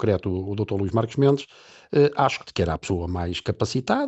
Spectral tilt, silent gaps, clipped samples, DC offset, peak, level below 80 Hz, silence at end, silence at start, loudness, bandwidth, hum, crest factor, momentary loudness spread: -6.5 dB/octave; none; under 0.1%; under 0.1%; -6 dBFS; -46 dBFS; 0 s; 0 s; -24 LUFS; 8.4 kHz; none; 18 dB; 7 LU